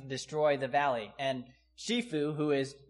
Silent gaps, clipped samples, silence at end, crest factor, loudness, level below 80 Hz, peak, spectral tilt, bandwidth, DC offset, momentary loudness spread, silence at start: none; under 0.1%; 0.1 s; 16 dB; -32 LUFS; -70 dBFS; -18 dBFS; -5 dB/octave; 11.5 kHz; under 0.1%; 7 LU; 0 s